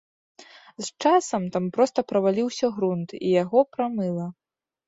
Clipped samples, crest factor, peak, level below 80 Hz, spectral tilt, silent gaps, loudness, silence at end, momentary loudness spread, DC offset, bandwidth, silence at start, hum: under 0.1%; 18 dB; -6 dBFS; -68 dBFS; -6 dB/octave; none; -24 LUFS; 0.55 s; 9 LU; under 0.1%; 8 kHz; 0.4 s; none